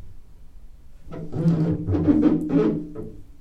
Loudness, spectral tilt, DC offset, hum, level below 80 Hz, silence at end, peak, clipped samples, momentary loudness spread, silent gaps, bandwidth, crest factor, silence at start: -22 LUFS; -10.5 dB/octave; under 0.1%; none; -44 dBFS; 0 s; -8 dBFS; under 0.1%; 19 LU; none; 6.2 kHz; 16 dB; 0 s